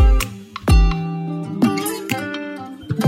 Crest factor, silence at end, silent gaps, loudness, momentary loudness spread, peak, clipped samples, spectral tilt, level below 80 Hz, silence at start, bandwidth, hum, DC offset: 16 dB; 0 s; none; -21 LUFS; 11 LU; -2 dBFS; under 0.1%; -6 dB/octave; -20 dBFS; 0 s; 16.5 kHz; none; under 0.1%